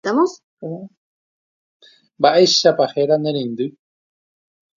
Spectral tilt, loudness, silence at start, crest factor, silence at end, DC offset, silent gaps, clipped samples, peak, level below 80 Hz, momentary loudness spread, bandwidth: -4 dB/octave; -17 LUFS; 0.05 s; 20 dB; 1.1 s; under 0.1%; 0.44-0.57 s, 0.97-1.80 s; under 0.1%; 0 dBFS; -70 dBFS; 19 LU; 7.4 kHz